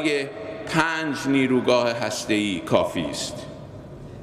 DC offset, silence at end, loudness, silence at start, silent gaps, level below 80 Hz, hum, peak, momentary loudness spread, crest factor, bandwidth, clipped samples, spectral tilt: under 0.1%; 0 s; -23 LUFS; 0 s; none; -52 dBFS; none; -4 dBFS; 19 LU; 20 dB; 14.5 kHz; under 0.1%; -4.5 dB/octave